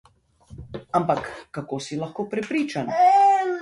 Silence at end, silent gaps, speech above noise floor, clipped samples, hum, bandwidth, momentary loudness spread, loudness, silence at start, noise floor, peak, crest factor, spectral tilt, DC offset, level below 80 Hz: 0 s; none; 28 dB; under 0.1%; none; 11.5 kHz; 18 LU; -22 LUFS; 0.5 s; -50 dBFS; -8 dBFS; 16 dB; -5.5 dB/octave; under 0.1%; -56 dBFS